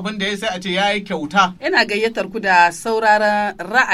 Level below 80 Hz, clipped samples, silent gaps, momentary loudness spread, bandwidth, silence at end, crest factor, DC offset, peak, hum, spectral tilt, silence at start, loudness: -54 dBFS; under 0.1%; none; 8 LU; 13.5 kHz; 0 s; 16 dB; under 0.1%; 0 dBFS; none; -3.5 dB/octave; 0 s; -17 LUFS